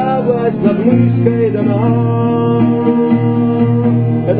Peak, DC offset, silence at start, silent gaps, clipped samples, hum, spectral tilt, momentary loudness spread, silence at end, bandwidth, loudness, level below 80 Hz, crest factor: 0 dBFS; 0.4%; 0 s; none; under 0.1%; none; -13 dB/octave; 2 LU; 0 s; 4 kHz; -13 LUFS; -48 dBFS; 12 dB